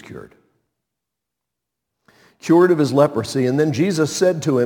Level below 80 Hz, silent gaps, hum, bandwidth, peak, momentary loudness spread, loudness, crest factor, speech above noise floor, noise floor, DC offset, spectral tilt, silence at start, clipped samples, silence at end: -62 dBFS; none; none; 18 kHz; 0 dBFS; 6 LU; -17 LUFS; 18 dB; 66 dB; -82 dBFS; under 0.1%; -6 dB/octave; 0.1 s; under 0.1%; 0 s